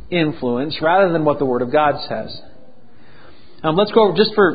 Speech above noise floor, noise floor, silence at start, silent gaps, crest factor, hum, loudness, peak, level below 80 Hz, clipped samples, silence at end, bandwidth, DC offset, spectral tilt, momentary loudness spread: 32 dB; -49 dBFS; 0 s; none; 18 dB; none; -17 LUFS; 0 dBFS; -50 dBFS; under 0.1%; 0 s; 5 kHz; 2%; -11 dB/octave; 12 LU